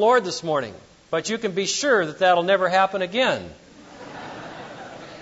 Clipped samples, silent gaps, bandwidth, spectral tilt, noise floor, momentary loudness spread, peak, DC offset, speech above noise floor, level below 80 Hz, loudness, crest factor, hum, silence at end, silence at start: under 0.1%; none; 8 kHz; -3 dB/octave; -42 dBFS; 19 LU; -6 dBFS; under 0.1%; 21 dB; -62 dBFS; -21 LUFS; 16 dB; none; 0 s; 0 s